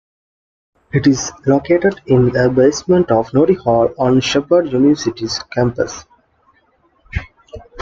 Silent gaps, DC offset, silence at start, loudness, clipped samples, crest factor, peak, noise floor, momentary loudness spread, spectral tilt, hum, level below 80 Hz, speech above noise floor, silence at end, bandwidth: none; under 0.1%; 0.95 s; -15 LUFS; under 0.1%; 14 dB; -2 dBFS; -57 dBFS; 10 LU; -6 dB/octave; none; -40 dBFS; 43 dB; 0 s; 7.8 kHz